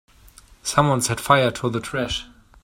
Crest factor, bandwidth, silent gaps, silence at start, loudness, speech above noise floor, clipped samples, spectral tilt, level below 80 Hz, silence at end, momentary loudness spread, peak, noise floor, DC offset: 22 dB; 16.5 kHz; none; 0.65 s; -21 LUFS; 29 dB; under 0.1%; -4 dB/octave; -46 dBFS; 0.4 s; 10 LU; 0 dBFS; -49 dBFS; under 0.1%